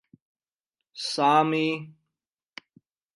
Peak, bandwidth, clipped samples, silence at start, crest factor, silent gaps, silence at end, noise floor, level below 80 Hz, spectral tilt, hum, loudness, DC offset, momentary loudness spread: -8 dBFS; 11.5 kHz; under 0.1%; 0.95 s; 20 dB; none; 1.25 s; -88 dBFS; -82 dBFS; -4.5 dB/octave; none; -24 LUFS; under 0.1%; 26 LU